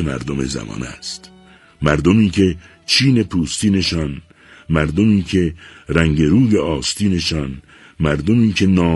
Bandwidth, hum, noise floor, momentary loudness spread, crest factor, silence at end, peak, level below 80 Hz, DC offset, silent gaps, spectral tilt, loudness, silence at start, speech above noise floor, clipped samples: 11.5 kHz; none; -44 dBFS; 15 LU; 16 dB; 0 s; 0 dBFS; -34 dBFS; under 0.1%; none; -5.5 dB/octave; -17 LUFS; 0 s; 28 dB; under 0.1%